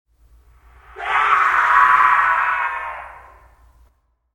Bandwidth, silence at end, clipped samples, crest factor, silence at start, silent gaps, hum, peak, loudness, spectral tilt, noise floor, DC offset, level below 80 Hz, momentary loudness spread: 15 kHz; 1.2 s; under 0.1%; 18 dB; 0.95 s; none; none; 0 dBFS; -15 LUFS; -1.5 dB/octave; -60 dBFS; under 0.1%; -52 dBFS; 17 LU